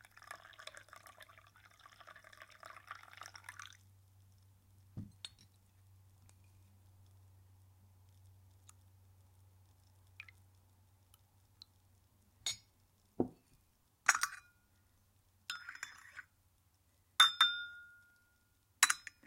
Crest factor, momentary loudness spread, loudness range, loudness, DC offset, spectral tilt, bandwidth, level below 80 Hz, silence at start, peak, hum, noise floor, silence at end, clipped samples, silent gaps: 34 dB; 26 LU; 24 LU; -34 LUFS; under 0.1%; 0 dB/octave; 16.5 kHz; -76 dBFS; 0.3 s; -10 dBFS; none; -74 dBFS; 0.25 s; under 0.1%; none